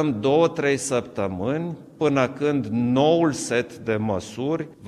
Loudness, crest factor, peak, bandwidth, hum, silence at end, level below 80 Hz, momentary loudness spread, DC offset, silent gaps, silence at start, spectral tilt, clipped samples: -23 LUFS; 16 dB; -6 dBFS; 13.5 kHz; none; 0 s; -58 dBFS; 8 LU; under 0.1%; none; 0 s; -5.5 dB/octave; under 0.1%